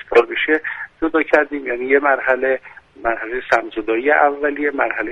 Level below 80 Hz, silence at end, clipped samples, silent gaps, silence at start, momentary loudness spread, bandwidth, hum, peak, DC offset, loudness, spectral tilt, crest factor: -50 dBFS; 0 s; under 0.1%; none; 0.05 s; 9 LU; 8 kHz; none; 0 dBFS; under 0.1%; -18 LUFS; -4.5 dB/octave; 18 dB